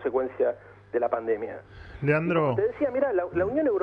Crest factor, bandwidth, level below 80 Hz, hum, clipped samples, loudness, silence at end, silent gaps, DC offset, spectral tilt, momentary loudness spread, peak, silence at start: 16 dB; 5.2 kHz; -54 dBFS; 50 Hz at -50 dBFS; under 0.1%; -27 LUFS; 0 s; none; under 0.1%; -9.5 dB/octave; 12 LU; -12 dBFS; 0 s